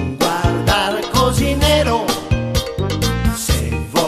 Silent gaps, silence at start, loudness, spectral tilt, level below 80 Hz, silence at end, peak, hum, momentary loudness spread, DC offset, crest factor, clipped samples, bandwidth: none; 0 s; -17 LUFS; -4.5 dB/octave; -24 dBFS; 0 s; -2 dBFS; none; 5 LU; under 0.1%; 16 dB; under 0.1%; 14 kHz